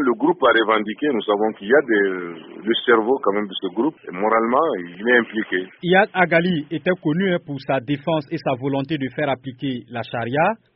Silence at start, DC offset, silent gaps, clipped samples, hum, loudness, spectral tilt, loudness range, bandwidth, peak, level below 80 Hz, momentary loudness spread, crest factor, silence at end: 0 s; under 0.1%; none; under 0.1%; none; -20 LUFS; -4 dB/octave; 4 LU; 5.6 kHz; -2 dBFS; -62 dBFS; 9 LU; 18 dB; 0.2 s